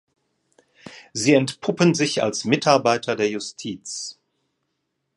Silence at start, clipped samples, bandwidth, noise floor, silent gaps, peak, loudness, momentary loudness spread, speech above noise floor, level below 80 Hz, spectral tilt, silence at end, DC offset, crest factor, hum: 0.85 s; under 0.1%; 11.5 kHz; -76 dBFS; none; 0 dBFS; -21 LUFS; 13 LU; 55 dB; -66 dBFS; -4.5 dB/octave; 1.05 s; under 0.1%; 22 dB; none